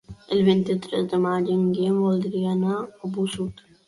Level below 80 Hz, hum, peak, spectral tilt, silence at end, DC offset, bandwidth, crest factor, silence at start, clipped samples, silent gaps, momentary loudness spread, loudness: -58 dBFS; none; -8 dBFS; -7.5 dB/octave; 0.35 s; under 0.1%; 11.5 kHz; 16 dB; 0.1 s; under 0.1%; none; 9 LU; -24 LUFS